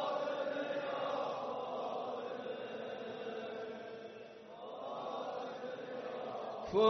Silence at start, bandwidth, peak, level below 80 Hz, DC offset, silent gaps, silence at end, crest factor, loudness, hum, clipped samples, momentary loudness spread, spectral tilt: 0 s; 6.2 kHz; -18 dBFS; -76 dBFS; under 0.1%; none; 0 s; 20 dB; -42 LUFS; none; under 0.1%; 10 LU; -2.5 dB/octave